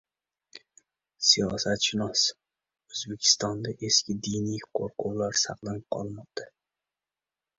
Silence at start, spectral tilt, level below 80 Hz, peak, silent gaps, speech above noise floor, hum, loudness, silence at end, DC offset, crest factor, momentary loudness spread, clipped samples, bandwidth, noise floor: 0.55 s; -2.5 dB/octave; -60 dBFS; -6 dBFS; none; over 62 dB; none; -26 LUFS; 1.1 s; under 0.1%; 26 dB; 15 LU; under 0.1%; 8 kHz; under -90 dBFS